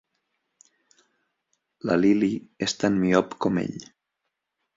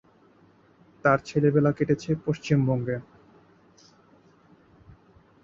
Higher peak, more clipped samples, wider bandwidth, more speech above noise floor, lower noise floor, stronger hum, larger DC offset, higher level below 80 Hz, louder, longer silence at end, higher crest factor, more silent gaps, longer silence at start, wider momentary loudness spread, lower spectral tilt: about the same, -6 dBFS vs -8 dBFS; neither; about the same, 8 kHz vs 7.6 kHz; first, 58 dB vs 35 dB; first, -81 dBFS vs -58 dBFS; neither; neither; about the same, -60 dBFS vs -58 dBFS; about the same, -24 LUFS vs -25 LUFS; second, 0.95 s vs 2.4 s; about the same, 22 dB vs 20 dB; neither; first, 1.85 s vs 1.05 s; first, 12 LU vs 7 LU; second, -5.5 dB/octave vs -8 dB/octave